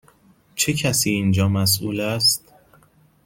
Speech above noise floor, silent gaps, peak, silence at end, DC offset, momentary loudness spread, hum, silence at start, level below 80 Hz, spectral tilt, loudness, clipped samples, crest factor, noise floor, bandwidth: 36 dB; none; -4 dBFS; 0.9 s; under 0.1%; 6 LU; none; 0.55 s; -54 dBFS; -3.5 dB/octave; -19 LUFS; under 0.1%; 18 dB; -56 dBFS; 17 kHz